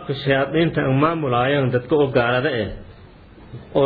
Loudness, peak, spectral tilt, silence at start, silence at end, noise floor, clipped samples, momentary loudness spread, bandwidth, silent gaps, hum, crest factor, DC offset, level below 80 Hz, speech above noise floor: -19 LUFS; -4 dBFS; -10 dB/octave; 0 s; 0 s; -44 dBFS; under 0.1%; 8 LU; 4.9 kHz; none; none; 16 dB; under 0.1%; -46 dBFS; 25 dB